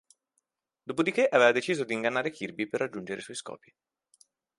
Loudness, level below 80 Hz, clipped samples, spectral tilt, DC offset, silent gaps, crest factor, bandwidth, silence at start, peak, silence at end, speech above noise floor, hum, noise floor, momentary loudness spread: -28 LUFS; -76 dBFS; under 0.1%; -4 dB/octave; under 0.1%; none; 24 dB; 11.5 kHz; 0.85 s; -6 dBFS; 1 s; 51 dB; none; -79 dBFS; 18 LU